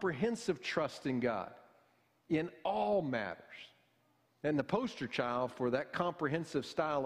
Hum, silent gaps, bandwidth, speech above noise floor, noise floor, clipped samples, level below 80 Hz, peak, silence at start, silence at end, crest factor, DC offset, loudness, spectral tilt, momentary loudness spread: none; none; 14.5 kHz; 38 dB; -74 dBFS; under 0.1%; -70 dBFS; -18 dBFS; 0 s; 0 s; 18 dB; under 0.1%; -36 LUFS; -6 dB/octave; 8 LU